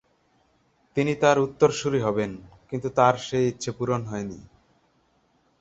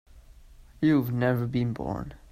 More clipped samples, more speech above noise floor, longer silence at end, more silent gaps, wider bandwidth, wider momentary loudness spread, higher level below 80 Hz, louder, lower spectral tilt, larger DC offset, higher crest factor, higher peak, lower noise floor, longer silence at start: neither; first, 42 dB vs 25 dB; first, 1.2 s vs 0.15 s; neither; second, 8.2 kHz vs 15 kHz; first, 13 LU vs 10 LU; second, -58 dBFS vs -50 dBFS; first, -24 LUFS vs -27 LUFS; second, -5.5 dB/octave vs -9 dB/octave; neither; first, 22 dB vs 16 dB; first, -4 dBFS vs -12 dBFS; first, -66 dBFS vs -51 dBFS; first, 0.95 s vs 0.15 s